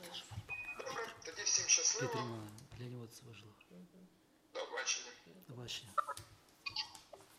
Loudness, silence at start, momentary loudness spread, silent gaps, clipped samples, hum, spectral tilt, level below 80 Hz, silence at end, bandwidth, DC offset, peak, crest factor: -38 LUFS; 0 s; 25 LU; none; under 0.1%; none; -1 dB/octave; -74 dBFS; 0 s; 16 kHz; under 0.1%; -18 dBFS; 26 dB